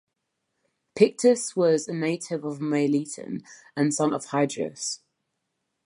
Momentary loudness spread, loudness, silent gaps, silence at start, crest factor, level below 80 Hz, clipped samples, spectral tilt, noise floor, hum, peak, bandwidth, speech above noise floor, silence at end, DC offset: 14 LU; -25 LUFS; none; 0.95 s; 22 dB; -76 dBFS; under 0.1%; -5 dB/octave; -80 dBFS; none; -4 dBFS; 11.5 kHz; 55 dB; 0.9 s; under 0.1%